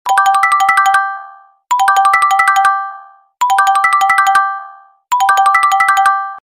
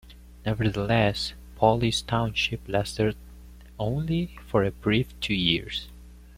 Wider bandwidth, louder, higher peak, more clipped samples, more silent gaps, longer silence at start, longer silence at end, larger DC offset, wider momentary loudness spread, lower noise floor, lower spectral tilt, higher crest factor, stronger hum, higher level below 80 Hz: about the same, 16 kHz vs 16 kHz; first, -11 LUFS vs -26 LUFS; first, 0 dBFS vs -6 dBFS; neither; neither; about the same, 0.05 s vs 0.05 s; about the same, 0.1 s vs 0.05 s; neither; about the same, 9 LU vs 10 LU; second, -37 dBFS vs -46 dBFS; second, 2 dB/octave vs -5.5 dB/octave; second, 12 dB vs 22 dB; second, none vs 60 Hz at -45 dBFS; second, -60 dBFS vs -44 dBFS